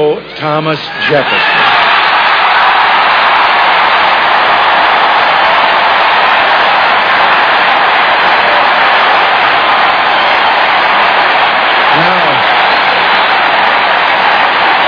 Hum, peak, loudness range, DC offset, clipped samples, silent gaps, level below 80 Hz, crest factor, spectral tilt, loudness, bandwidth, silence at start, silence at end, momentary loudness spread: none; 0 dBFS; 1 LU; under 0.1%; 0.9%; none; -48 dBFS; 8 dB; -4 dB/octave; -7 LUFS; 5.4 kHz; 0 s; 0 s; 1 LU